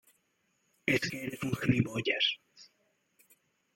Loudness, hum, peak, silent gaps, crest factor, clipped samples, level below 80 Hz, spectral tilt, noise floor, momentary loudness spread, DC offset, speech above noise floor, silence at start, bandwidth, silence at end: -31 LUFS; none; -14 dBFS; none; 22 dB; under 0.1%; -62 dBFS; -5 dB/octave; -76 dBFS; 8 LU; under 0.1%; 44 dB; 0.85 s; 16.5 kHz; 1.1 s